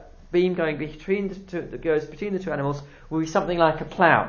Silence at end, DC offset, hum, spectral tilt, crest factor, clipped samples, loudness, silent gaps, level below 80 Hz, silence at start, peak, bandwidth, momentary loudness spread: 0 s; under 0.1%; none; -6.5 dB/octave; 22 dB; under 0.1%; -25 LUFS; none; -48 dBFS; 0 s; -2 dBFS; 7.2 kHz; 10 LU